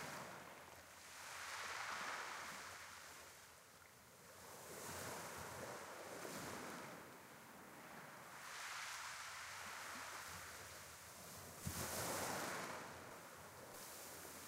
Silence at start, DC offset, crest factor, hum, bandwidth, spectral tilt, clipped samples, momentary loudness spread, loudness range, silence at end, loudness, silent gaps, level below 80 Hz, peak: 0 s; under 0.1%; 20 dB; none; 16 kHz; -2 dB/octave; under 0.1%; 13 LU; 5 LU; 0 s; -50 LUFS; none; -76 dBFS; -32 dBFS